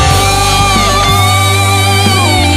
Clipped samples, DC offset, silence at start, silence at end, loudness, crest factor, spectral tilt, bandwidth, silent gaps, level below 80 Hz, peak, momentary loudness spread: 0.1%; under 0.1%; 0 s; 0 s; -8 LUFS; 8 dB; -3.5 dB/octave; 16 kHz; none; -22 dBFS; 0 dBFS; 1 LU